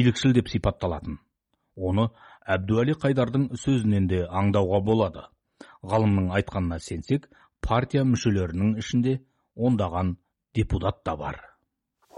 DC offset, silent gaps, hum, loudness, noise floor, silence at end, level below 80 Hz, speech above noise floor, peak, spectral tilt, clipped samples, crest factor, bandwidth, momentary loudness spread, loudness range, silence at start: under 0.1%; none; none; -25 LUFS; -72 dBFS; 0.7 s; -44 dBFS; 48 dB; -8 dBFS; -7 dB/octave; under 0.1%; 18 dB; 11 kHz; 11 LU; 3 LU; 0 s